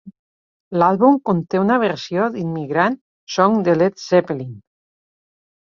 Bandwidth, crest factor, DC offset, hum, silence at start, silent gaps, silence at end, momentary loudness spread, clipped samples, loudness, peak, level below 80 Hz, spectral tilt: 7.4 kHz; 18 dB; under 0.1%; none; 0.05 s; 0.19-0.71 s, 3.01-3.27 s; 1.05 s; 11 LU; under 0.1%; -18 LUFS; 0 dBFS; -62 dBFS; -6.5 dB/octave